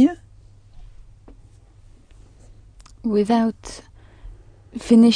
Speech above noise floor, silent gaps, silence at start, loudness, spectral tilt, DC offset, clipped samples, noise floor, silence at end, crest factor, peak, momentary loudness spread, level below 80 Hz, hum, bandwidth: 31 dB; none; 0 s; -20 LUFS; -6 dB/octave; under 0.1%; under 0.1%; -48 dBFS; 0 s; 18 dB; -4 dBFS; 22 LU; -46 dBFS; none; 10 kHz